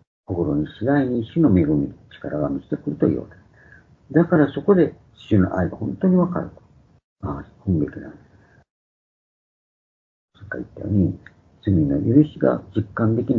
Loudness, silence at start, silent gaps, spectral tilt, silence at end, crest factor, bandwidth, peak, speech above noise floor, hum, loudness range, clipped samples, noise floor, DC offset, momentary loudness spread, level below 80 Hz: -21 LUFS; 0.3 s; 7.04-7.16 s, 8.70-10.28 s; -11 dB/octave; 0 s; 20 dB; 4.3 kHz; -2 dBFS; 30 dB; none; 11 LU; under 0.1%; -50 dBFS; under 0.1%; 14 LU; -46 dBFS